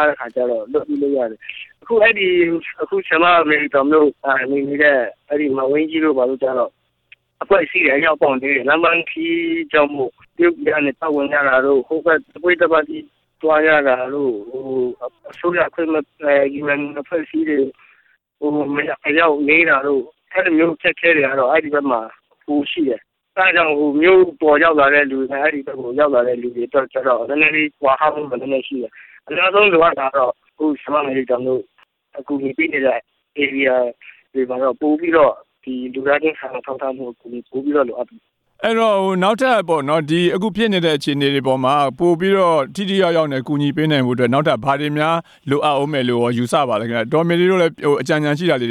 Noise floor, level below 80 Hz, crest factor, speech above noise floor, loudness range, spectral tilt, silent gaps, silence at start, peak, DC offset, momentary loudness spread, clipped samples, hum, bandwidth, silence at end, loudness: -57 dBFS; -58 dBFS; 16 dB; 40 dB; 5 LU; -6 dB/octave; none; 0 s; -2 dBFS; under 0.1%; 11 LU; under 0.1%; none; 12.5 kHz; 0 s; -17 LUFS